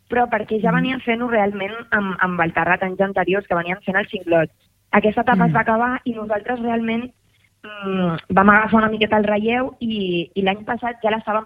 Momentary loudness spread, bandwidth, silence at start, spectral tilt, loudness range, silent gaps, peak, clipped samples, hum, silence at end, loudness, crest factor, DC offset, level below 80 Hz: 8 LU; 4.9 kHz; 0.1 s; -8.5 dB/octave; 2 LU; none; -2 dBFS; under 0.1%; none; 0 s; -19 LUFS; 18 dB; under 0.1%; -50 dBFS